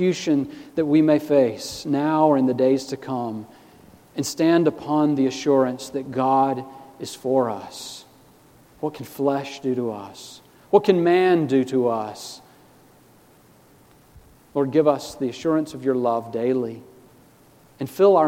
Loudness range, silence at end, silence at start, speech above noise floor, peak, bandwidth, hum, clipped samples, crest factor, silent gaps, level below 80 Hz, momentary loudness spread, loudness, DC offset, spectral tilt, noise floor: 6 LU; 0 s; 0 s; 32 dB; -2 dBFS; 16.5 kHz; none; under 0.1%; 20 dB; none; -64 dBFS; 17 LU; -22 LUFS; under 0.1%; -6 dB/octave; -53 dBFS